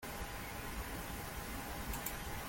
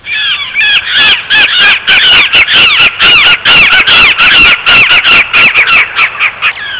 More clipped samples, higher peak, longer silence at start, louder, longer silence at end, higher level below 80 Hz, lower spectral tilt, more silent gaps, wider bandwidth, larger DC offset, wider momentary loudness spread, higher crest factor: neither; second, -22 dBFS vs 0 dBFS; about the same, 0 s vs 0.05 s; second, -43 LUFS vs -2 LUFS; about the same, 0 s vs 0 s; second, -50 dBFS vs -36 dBFS; about the same, -3.5 dB/octave vs -4.5 dB/octave; neither; first, 17 kHz vs 4 kHz; neither; second, 3 LU vs 6 LU; first, 22 dB vs 6 dB